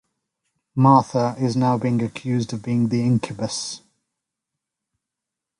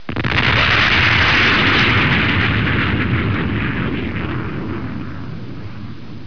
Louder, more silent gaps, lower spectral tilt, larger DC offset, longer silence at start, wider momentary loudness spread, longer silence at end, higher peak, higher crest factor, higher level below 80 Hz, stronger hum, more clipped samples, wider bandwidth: second, -21 LUFS vs -15 LUFS; neither; about the same, -6.5 dB/octave vs -5.5 dB/octave; second, under 0.1% vs 3%; first, 0.75 s vs 0.1 s; second, 12 LU vs 19 LU; first, 1.8 s vs 0 s; about the same, -2 dBFS vs -2 dBFS; first, 20 dB vs 14 dB; second, -60 dBFS vs -32 dBFS; neither; neither; first, 11 kHz vs 5.4 kHz